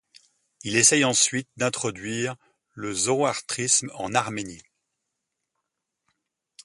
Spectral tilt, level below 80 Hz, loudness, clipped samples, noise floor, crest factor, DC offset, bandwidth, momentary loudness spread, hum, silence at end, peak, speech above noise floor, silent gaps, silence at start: -2 dB/octave; -64 dBFS; -23 LUFS; under 0.1%; -82 dBFS; 24 dB; under 0.1%; 11.5 kHz; 17 LU; none; 2.05 s; -4 dBFS; 57 dB; none; 0.65 s